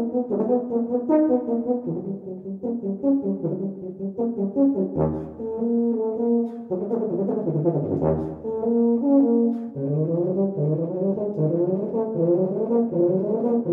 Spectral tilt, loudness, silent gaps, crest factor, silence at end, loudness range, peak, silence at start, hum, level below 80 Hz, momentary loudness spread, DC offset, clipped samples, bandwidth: -13.5 dB/octave; -23 LUFS; none; 14 dB; 0 s; 3 LU; -8 dBFS; 0 s; none; -54 dBFS; 9 LU; under 0.1%; under 0.1%; 2.6 kHz